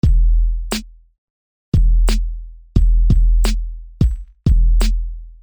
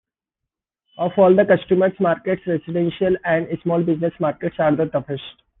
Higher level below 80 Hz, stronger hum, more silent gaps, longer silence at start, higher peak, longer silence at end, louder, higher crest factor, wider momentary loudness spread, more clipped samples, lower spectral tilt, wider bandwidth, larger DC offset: first, -16 dBFS vs -56 dBFS; neither; first, 1.18-1.72 s vs none; second, 0.05 s vs 1 s; about the same, -2 dBFS vs -2 dBFS; second, 0.1 s vs 0.3 s; about the same, -19 LUFS vs -19 LUFS; about the same, 14 dB vs 16 dB; about the same, 11 LU vs 10 LU; neither; second, -6 dB/octave vs -10.5 dB/octave; first, 9.8 kHz vs 4 kHz; neither